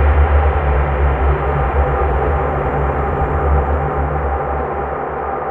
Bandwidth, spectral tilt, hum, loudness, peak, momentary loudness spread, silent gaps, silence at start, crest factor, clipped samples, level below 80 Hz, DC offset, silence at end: 3.6 kHz; -10 dB/octave; none; -17 LUFS; -2 dBFS; 6 LU; none; 0 s; 12 dB; under 0.1%; -18 dBFS; 0.2%; 0 s